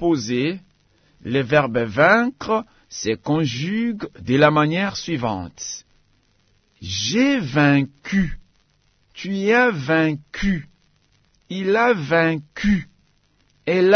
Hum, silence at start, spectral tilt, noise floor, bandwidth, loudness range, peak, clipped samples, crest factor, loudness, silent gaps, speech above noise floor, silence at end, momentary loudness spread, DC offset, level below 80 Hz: none; 0 s; -5.5 dB/octave; -62 dBFS; 6.6 kHz; 3 LU; -2 dBFS; under 0.1%; 20 dB; -20 LUFS; none; 43 dB; 0 s; 14 LU; under 0.1%; -44 dBFS